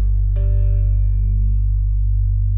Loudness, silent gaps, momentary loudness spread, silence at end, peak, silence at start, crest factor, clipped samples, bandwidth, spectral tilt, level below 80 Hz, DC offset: -19 LUFS; none; 2 LU; 0 s; -8 dBFS; 0 s; 6 dB; under 0.1%; 0.6 kHz; -12.5 dB/octave; -16 dBFS; under 0.1%